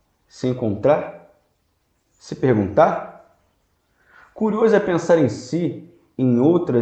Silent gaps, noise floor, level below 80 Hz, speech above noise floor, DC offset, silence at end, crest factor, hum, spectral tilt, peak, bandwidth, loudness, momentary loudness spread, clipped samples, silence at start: none; -67 dBFS; -58 dBFS; 49 dB; under 0.1%; 0 s; 20 dB; none; -7.5 dB/octave; 0 dBFS; 8.8 kHz; -19 LUFS; 16 LU; under 0.1%; 0.35 s